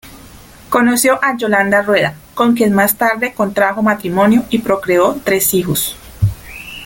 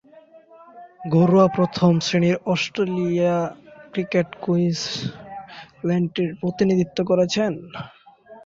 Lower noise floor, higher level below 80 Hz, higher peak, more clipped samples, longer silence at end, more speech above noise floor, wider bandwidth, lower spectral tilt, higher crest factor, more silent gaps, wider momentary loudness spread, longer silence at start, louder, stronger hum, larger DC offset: second, -38 dBFS vs -49 dBFS; first, -40 dBFS vs -58 dBFS; first, 0 dBFS vs -6 dBFS; neither; about the same, 0 s vs 0.05 s; second, 25 dB vs 29 dB; first, 17 kHz vs 7.6 kHz; second, -4.5 dB/octave vs -6.5 dB/octave; about the same, 14 dB vs 16 dB; neither; second, 7 LU vs 19 LU; second, 0.05 s vs 0.75 s; first, -14 LUFS vs -21 LUFS; neither; neither